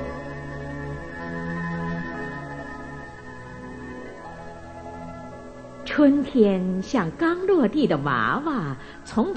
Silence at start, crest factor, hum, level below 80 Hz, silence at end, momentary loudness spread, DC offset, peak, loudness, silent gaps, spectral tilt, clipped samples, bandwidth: 0 s; 20 dB; none; -48 dBFS; 0 s; 19 LU; 0.1%; -6 dBFS; -24 LUFS; none; -7 dB/octave; under 0.1%; 9 kHz